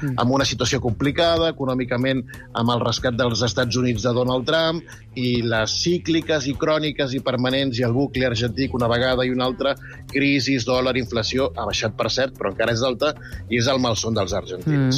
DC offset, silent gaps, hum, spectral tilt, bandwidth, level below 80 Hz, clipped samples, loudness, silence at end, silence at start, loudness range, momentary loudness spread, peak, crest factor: under 0.1%; none; none; -5 dB/octave; 15 kHz; -42 dBFS; under 0.1%; -21 LUFS; 0 s; 0 s; 1 LU; 5 LU; -8 dBFS; 12 dB